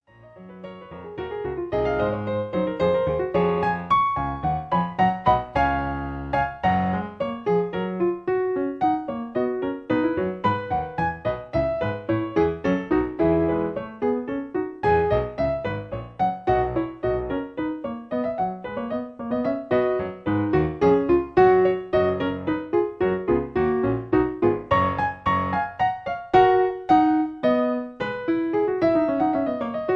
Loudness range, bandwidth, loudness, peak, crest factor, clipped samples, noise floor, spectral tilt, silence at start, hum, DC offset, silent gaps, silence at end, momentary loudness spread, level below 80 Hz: 5 LU; 6.2 kHz; -23 LUFS; -4 dBFS; 20 dB; under 0.1%; -46 dBFS; -8.5 dB/octave; 0.25 s; none; under 0.1%; none; 0 s; 9 LU; -44 dBFS